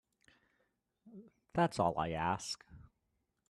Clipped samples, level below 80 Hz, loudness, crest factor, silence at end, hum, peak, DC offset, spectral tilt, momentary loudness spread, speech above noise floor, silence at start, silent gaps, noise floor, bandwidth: under 0.1%; -64 dBFS; -36 LUFS; 22 dB; 0.65 s; none; -18 dBFS; under 0.1%; -5 dB/octave; 25 LU; 48 dB; 1.05 s; none; -83 dBFS; 13 kHz